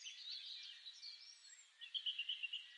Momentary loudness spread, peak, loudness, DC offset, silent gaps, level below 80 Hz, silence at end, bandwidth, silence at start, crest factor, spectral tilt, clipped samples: 15 LU; -32 dBFS; -47 LUFS; under 0.1%; none; under -90 dBFS; 0 s; 11 kHz; 0 s; 20 dB; 8 dB/octave; under 0.1%